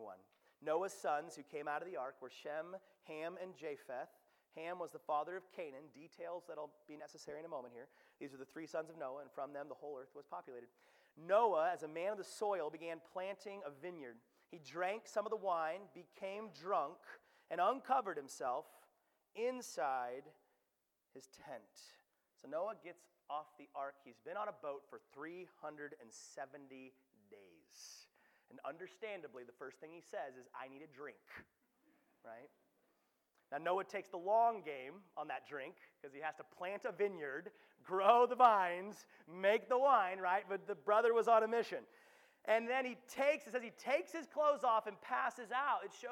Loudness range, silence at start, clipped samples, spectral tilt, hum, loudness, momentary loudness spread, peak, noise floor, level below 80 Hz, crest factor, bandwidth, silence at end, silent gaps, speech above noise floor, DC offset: 17 LU; 0 s; under 0.1%; -4 dB/octave; none; -40 LUFS; 22 LU; -16 dBFS; -86 dBFS; under -90 dBFS; 24 dB; 18 kHz; 0 s; none; 45 dB; under 0.1%